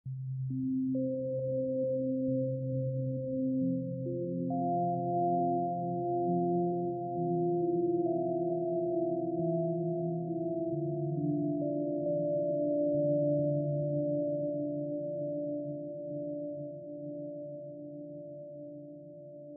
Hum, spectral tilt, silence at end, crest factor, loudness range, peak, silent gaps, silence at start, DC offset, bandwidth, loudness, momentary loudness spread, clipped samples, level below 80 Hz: none; -4 dB/octave; 0 s; 12 dB; 7 LU; -20 dBFS; none; 0.05 s; under 0.1%; 0.9 kHz; -33 LUFS; 13 LU; under 0.1%; -74 dBFS